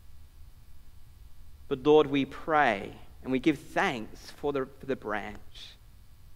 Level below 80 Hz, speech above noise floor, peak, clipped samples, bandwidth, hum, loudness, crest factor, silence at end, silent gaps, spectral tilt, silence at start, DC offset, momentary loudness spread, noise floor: -52 dBFS; 22 dB; -10 dBFS; under 0.1%; 15.5 kHz; none; -29 LUFS; 22 dB; 0 s; none; -6 dB/octave; 0.05 s; under 0.1%; 22 LU; -51 dBFS